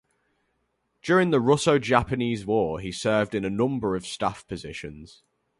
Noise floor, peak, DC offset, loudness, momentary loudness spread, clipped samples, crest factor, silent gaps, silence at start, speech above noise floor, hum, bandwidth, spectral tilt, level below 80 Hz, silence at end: -74 dBFS; -4 dBFS; under 0.1%; -24 LUFS; 16 LU; under 0.1%; 22 dB; none; 1.05 s; 50 dB; none; 11.5 kHz; -5.5 dB/octave; -52 dBFS; 0.55 s